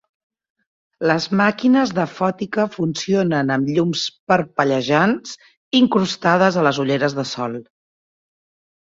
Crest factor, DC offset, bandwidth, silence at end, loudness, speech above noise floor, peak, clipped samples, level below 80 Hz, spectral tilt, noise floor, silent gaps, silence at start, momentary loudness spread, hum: 18 dB; under 0.1%; 7.8 kHz; 1.2 s; -19 LUFS; over 72 dB; -2 dBFS; under 0.1%; -60 dBFS; -5.5 dB/octave; under -90 dBFS; 4.19-4.27 s, 5.57-5.71 s; 1 s; 9 LU; none